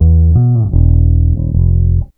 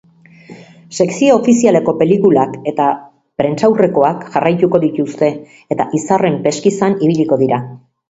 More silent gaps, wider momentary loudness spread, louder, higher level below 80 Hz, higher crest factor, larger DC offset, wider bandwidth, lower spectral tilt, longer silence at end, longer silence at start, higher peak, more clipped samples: neither; second, 4 LU vs 9 LU; first, -11 LUFS vs -14 LUFS; first, -14 dBFS vs -56 dBFS; about the same, 10 dB vs 14 dB; neither; second, 1.3 kHz vs 8 kHz; first, -15 dB/octave vs -6.5 dB/octave; second, 0.1 s vs 0.35 s; second, 0 s vs 0.5 s; about the same, 0 dBFS vs 0 dBFS; first, 0.7% vs under 0.1%